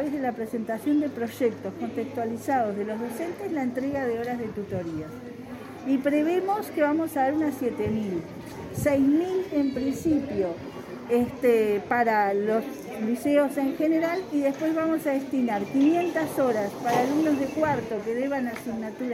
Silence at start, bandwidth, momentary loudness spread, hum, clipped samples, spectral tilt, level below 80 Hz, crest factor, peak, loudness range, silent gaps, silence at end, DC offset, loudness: 0 s; 16 kHz; 10 LU; none; under 0.1%; -6.5 dB/octave; -58 dBFS; 16 dB; -10 dBFS; 5 LU; none; 0 s; under 0.1%; -26 LUFS